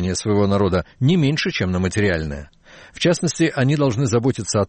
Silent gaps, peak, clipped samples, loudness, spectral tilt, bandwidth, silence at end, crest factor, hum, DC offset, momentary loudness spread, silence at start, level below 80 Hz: none; -8 dBFS; under 0.1%; -19 LUFS; -5.5 dB/octave; 8.8 kHz; 0 s; 12 dB; none; under 0.1%; 3 LU; 0 s; -42 dBFS